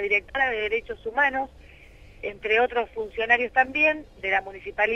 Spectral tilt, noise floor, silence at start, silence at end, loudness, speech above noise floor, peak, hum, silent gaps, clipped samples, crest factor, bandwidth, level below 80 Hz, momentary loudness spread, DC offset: -4.5 dB/octave; -48 dBFS; 0 s; 0 s; -24 LUFS; 23 dB; -6 dBFS; none; none; under 0.1%; 20 dB; 7.4 kHz; -52 dBFS; 12 LU; under 0.1%